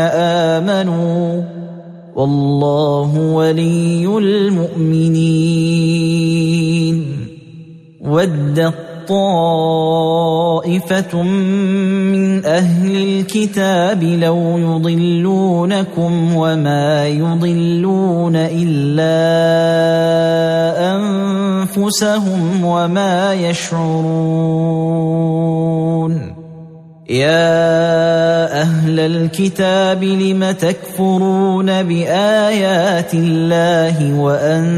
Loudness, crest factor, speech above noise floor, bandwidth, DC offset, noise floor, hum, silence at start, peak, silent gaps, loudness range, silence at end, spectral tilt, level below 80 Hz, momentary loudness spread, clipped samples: -14 LUFS; 12 dB; 23 dB; 14 kHz; under 0.1%; -36 dBFS; none; 0 s; -2 dBFS; none; 2 LU; 0 s; -6.5 dB/octave; -54 dBFS; 4 LU; under 0.1%